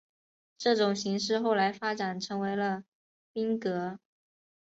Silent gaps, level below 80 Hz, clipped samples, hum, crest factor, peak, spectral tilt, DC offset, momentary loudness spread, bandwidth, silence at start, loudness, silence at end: 2.88-3.34 s; -76 dBFS; under 0.1%; none; 18 dB; -14 dBFS; -4.5 dB/octave; under 0.1%; 11 LU; 8 kHz; 0.6 s; -30 LUFS; 0.75 s